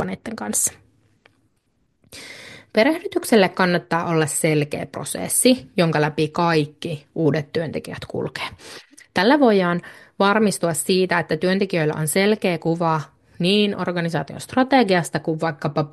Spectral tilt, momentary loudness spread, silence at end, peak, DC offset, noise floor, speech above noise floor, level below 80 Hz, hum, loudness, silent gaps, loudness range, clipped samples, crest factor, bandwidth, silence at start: -4.5 dB/octave; 13 LU; 0.05 s; -2 dBFS; under 0.1%; -67 dBFS; 47 dB; -60 dBFS; none; -20 LUFS; none; 3 LU; under 0.1%; 20 dB; 12.5 kHz; 0 s